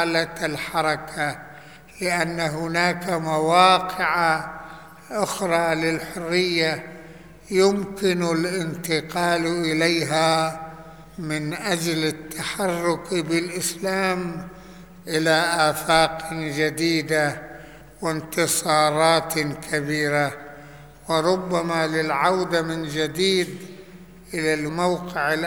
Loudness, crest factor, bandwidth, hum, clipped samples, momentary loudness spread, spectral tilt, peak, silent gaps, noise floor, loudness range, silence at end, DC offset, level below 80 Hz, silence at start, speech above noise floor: -22 LUFS; 20 dB; over 20 kHz; none; under 0.1%; 16 LU; -4 dB/octave; -2 dBFS; none; -44 dBFS; 3 LU; 0 s; 0.2%; -54 dBFS; 0 s; 22 dB